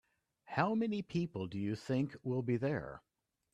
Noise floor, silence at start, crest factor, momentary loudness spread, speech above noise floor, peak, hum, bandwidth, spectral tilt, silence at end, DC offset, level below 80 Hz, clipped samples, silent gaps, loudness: -59 dBFS; 0.45 s; 20 dB; 7 LU; 22 dB; -18 dBFS; none; 10.5 kHz; -8 dB/octave; 0.55 s; under 0.1%; -70 dBFS; under 0.1%; none; -37 LUFS